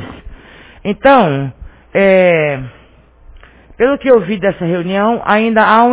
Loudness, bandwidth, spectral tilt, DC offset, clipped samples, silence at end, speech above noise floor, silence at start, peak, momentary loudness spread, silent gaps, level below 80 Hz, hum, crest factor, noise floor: -12 LUFS; 4 kHz; -10 dB/octave; under 0.1%; 0.2%; 0 s; 32 dB; 0 s; 0 dBFS; 15 LU; none; -40 dBFS; none; 12 dB; -43 dBFS